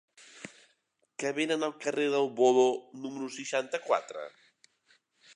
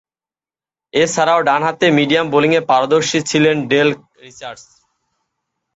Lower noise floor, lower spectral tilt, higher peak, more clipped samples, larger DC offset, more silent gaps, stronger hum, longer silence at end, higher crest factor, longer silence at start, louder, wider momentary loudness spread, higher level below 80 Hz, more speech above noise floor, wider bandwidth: second, -74 dBFS vs under -90 dBFS; about the same, -3.5 dB/octave vs -4.5 dB/octave; second, -12 dBFS vs 0 dBFS; neither; neither; neither; neither; about the same, 1.05 s vs 1.15 s; about the same, 20 dB vs 16 dB; second, 0.35 s vs 0.95 s; second, -30 LUFS vs -14 LUFS; first, 22 LU vs 17 LU; second, -86 dBFS vs -58 dBFS; second, 45 dB vs over 75 dB; first, 11 kHz vs 8.2 kHz